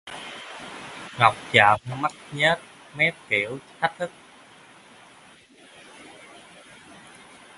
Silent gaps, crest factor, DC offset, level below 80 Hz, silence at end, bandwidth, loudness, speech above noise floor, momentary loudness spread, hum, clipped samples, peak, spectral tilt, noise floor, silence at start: none; 28 dB; under 0.1%; -64 dBFS; 3.5 s; 11.5 kHz; -22 LUFS; 29 dB; 27 LU; none; under 0.1%; 0 dBFS; -4 dB/octave; -52 dBFS; 0.05 s